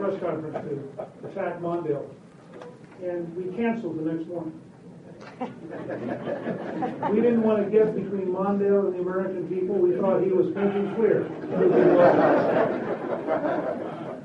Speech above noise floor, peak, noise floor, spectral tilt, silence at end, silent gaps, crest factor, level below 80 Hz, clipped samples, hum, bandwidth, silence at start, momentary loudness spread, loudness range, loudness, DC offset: 21 dB; -6 dBFS; -45 dBFS; -9 dB/octave; 0 s; none; 18 dB; -66 dBFS; under 0.1%; none; 6.4 kHz; 0 s; 16 LU; 11 LU; -25 LUFS; under 0.1%